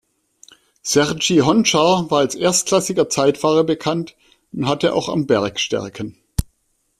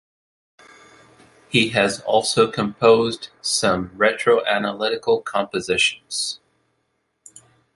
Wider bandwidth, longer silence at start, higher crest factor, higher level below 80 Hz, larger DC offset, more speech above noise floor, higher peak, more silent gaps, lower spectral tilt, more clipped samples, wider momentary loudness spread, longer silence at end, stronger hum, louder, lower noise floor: first, 15.5 kHz vs 11.5 kHz; second, 0.85 s vs 1.5 s; about the same, 16 dB vs 20 dB; first, -40 dBFS vs -56 dBFS; neither; about the same, 49 dB vs 51 dB; about the same, -2 dBFS vs -2 dBFS; neither; about the same, -4 dB/octave vs -3 dB/octave; neither; first, 13 LU vs 8 LU; second, 0.55 s vs 1.4 s; neither; about the same, -18 LUFS vs -20 LUFS; second, -66 dBFS vs -71 dBFS